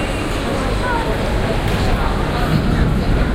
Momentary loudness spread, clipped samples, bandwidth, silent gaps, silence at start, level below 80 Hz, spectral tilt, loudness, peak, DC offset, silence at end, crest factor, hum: 3 LU; under 0.1%; 16 kHz; none; 0 s; -20 dBFS; -6 dB/octave; -18 LUFS; -2 dBFS; under 0.1%; 0 s; 14 dB; none